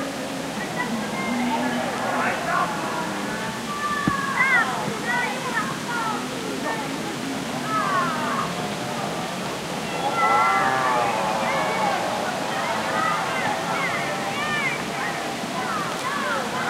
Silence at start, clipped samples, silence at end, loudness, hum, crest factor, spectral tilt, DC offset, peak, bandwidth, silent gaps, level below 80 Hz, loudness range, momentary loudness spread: 0 s; under 0.1%; 0 s; -24 LUFS; none; 18 dB; -3.5 dB/octave; under 0.1%; -6 dBFS; 16 kHz; none; -56 dBFS; 4 LU; 8 LU